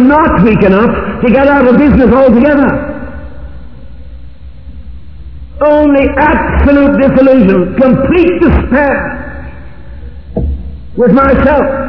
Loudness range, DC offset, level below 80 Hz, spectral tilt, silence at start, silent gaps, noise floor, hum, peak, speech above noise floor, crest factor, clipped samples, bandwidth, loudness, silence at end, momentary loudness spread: 7 LU; 3%; -22 dBFS; -10.5 dB/octave; 0 s; none; -30 dBFS; none; 0 dBFS; 23 dB; 8 dB; 2%; 5.4 kHz; -8 LUFS; 0 s; 18 LU